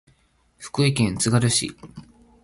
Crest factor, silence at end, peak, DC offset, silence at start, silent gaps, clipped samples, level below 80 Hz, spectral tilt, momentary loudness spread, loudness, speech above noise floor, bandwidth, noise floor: 18 dB; 0.4 s; -6 dBFS; under 0.1%; 0.6 s; none; under 0.1%; -50 dBFS; -4.5 dB/octave; 19 LU; -21 LUFS; 40 dB; 11.5 kHz; -62 dBFS